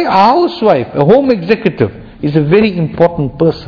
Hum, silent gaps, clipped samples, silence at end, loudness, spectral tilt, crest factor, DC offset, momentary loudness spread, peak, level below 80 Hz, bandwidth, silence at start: none; none; 1%; 0 s; -11 LUFS; -9 dB/octave; 10 dB; under 0.1%; 6 LU; 0 dBFS; -40 dBFS; 5.4 kHz; 0 s